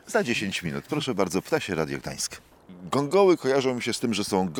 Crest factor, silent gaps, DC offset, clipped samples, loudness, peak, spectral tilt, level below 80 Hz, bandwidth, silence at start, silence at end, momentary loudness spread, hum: 18 dB; none; under 0.1%; under 0.1%; -26 LUFS; -8 dBFS; -4.5 dB/octave; -60 dBFS; 19 kHz; 0.05 s; 0 s; 10 LU; none